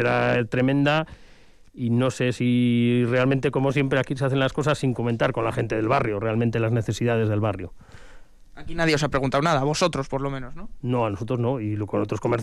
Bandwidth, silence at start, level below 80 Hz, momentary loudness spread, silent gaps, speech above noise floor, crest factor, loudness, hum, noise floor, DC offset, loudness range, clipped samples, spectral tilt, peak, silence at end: 12 kHz; 0 s; -46 dBFS; 7 LU; none; 26 dB; 12 dB; -23 LUFS; none; -49 dBFS; under 0.1%; 3 LU; under 0.1%; -6.5 dB/octave; -10 dBFS; 0 s